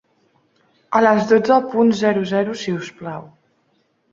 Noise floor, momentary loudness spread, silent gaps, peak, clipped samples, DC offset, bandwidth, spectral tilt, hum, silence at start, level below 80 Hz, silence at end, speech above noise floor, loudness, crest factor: -64 dBFS; 16 LU; none; -2 dBFS; under 0.1%; under 0.1%; 7.6 kHz; -6 dB/octave; none; 0.9 s; -62 dBFS; 0.85 s; 47 dB; -17 LUFS; 18 dB